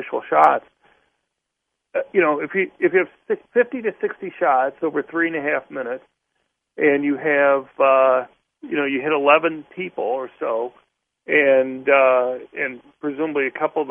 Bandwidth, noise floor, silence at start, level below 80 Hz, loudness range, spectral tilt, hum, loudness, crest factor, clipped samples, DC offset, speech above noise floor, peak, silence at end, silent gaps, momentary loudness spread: 3.6 kHz; -79 dBFS; 0 s; -72 dBFS; 4 LU; -7.5 dB/octave; none; -20 LUFS; 20 dB; under 0.1%; under 0.1%; 60 dB; 0 dBFS; 0 s; none; 12 LU